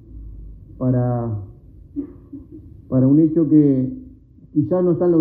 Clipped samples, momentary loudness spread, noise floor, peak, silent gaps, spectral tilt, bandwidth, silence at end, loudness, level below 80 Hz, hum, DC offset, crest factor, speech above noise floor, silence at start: under 0.1%; 24 LU; -44 dBFS; -4 dBFS; none; -15 dB/octave; 2.2 kHz; 0 s; -18 LUFS; -44 dBFS; none; under 0.1%; 16 dB; 28 dB; 0.1 s